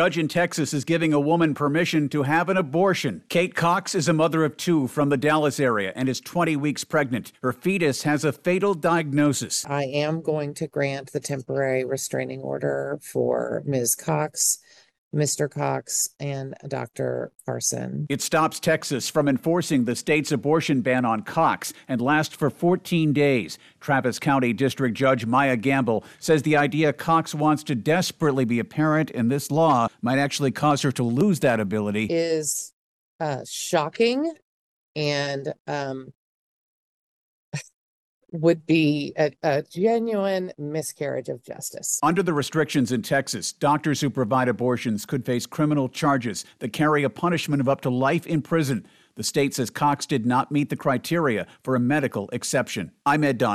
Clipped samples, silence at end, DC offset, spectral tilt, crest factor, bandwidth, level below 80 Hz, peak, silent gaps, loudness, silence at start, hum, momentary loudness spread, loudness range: under 0.1%; 0 s; under 0.1%; -5 dB/octave; 16 dB; 14.5 kHz; -64 dBFS; -8 dBFS; 14.98-15.11 s, 32.73-33.19 s, 34.42-34.95 s, 35.60-35.65 s, 36.15-37.52 s, 37.74-38.21 s; -23 LUFS; 0 s; none; 8 LU; 5 LU